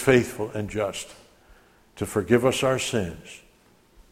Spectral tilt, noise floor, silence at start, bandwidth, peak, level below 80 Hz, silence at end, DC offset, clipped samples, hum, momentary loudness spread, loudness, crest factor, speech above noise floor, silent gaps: -5 dB/octave; -58 dBFS; 0 s; 16 kHz; -4 dBFS; -52 dBFS; 0.75 s; under 0.1%; under 0.1%; none; 21 LU; -25 LUFS; 22 dB; 34 dB; none